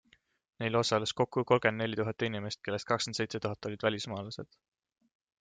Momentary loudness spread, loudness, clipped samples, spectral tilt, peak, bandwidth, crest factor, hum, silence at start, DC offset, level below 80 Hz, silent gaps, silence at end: 11 LU; -32 LUFS; under 0.1%; -4.5 dB/octave; -12 dBFS; 9.6 kHz; 22 dB; none; 0.6 s; under 0.1%; -70 dBFS; none; 0.95 s